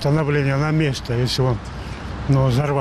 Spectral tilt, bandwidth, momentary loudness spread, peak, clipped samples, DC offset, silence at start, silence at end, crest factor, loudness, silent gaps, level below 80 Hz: -6.5 dB/octave; 13 kHz; 12 LU; -8 dBFS; under 0.1%; under 0.1%; 0 s; 0 s; 12 dB; -20 LUFS; none; -36 dBFS